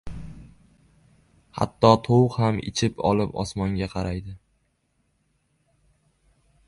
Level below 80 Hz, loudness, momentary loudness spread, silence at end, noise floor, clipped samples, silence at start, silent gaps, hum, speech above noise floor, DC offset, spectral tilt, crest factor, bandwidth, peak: -46 dBFS; -23 LUFS; 22 LU; 2.3 s; -70 dBFS; under 0.1%; 0.05 s; none; none; 48 dB; under 0.1%; -6.5 dB/octave; 24 dB; 11.5 kHz; -2 dBFS